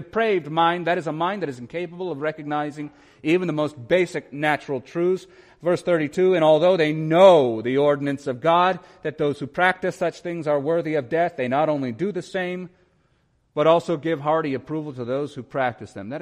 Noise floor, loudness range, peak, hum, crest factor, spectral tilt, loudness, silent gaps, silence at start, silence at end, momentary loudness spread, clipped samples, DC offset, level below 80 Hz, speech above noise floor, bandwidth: -65 dBFS; 6 LU; -2 dBFS; none; 20 dB; -6.5 dB/octave; -22 LUFS; none; 0 s; 0 s; 12 LU; under 0.1%; under 0.1%; -64 dBFS; 43 dB; 11 kHz